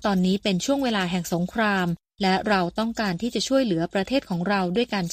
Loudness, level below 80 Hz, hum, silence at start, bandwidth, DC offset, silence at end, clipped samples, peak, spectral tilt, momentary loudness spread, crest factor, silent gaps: -24 LUFS; -52 dBFS; none; 0 s; 15.5 kHz; under 0.1%; 0 s; under 0.1%; -8 dBFS; -5 dB/octave; 4 LU; 16 dB; none